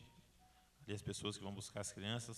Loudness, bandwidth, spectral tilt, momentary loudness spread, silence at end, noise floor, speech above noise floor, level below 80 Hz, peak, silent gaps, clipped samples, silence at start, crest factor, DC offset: -46 LUFS; 13 kHz; -4 dB/octave; 11 LU; 0 s; -70 dBFS; 24 dB; -70 dBFS; -28 dBFS; none; under 0.1%; 0 s; 20 dB; under 0.1%